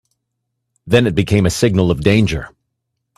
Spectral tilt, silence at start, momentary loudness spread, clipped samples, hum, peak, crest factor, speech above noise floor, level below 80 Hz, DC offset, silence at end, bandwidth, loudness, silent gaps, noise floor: -6 dB/octave; 0.85 s; 7 LU; under 0.1%; none; 0 dBFS; 16 dB; 61 dB; -38 dBFS; under 0.1%; 0.7 s; 14 kHz; -15 LUFS; none; -74 dBFS